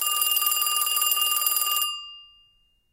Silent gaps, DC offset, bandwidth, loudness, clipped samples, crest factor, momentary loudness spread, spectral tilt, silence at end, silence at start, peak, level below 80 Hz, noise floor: none; under 0.1%; 17.5 kHz; -21 LUFS; under 0.1%; 18 dB; 8 LU; 5 dB/octave; 0.65 s; 0 s; -6 dBFS; -70 dBFS; -63 dBFS